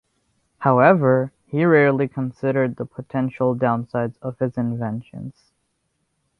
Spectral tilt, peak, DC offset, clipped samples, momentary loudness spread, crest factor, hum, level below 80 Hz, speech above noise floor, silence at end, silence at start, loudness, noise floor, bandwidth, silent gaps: -10 dB/octave; -2 dBFS; under 0.1%; under 0.1%; 14 LU; 20 dB; none; -60 dBFS; 52 dB; 1.1 s; 0.6 s; -20 LUFS; -72 dBFS; 5.8 kHz; none